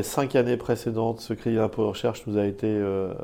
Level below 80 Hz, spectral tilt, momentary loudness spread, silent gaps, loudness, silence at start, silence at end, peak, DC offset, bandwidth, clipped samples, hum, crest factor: -54 dBFS; -6.5 dB/octave; 5 LU; none; -26 LUFS; 0 s; 0 s; -8 dBFS; under 0.1%; 17 kHz; under 0.1%; none; 18 dB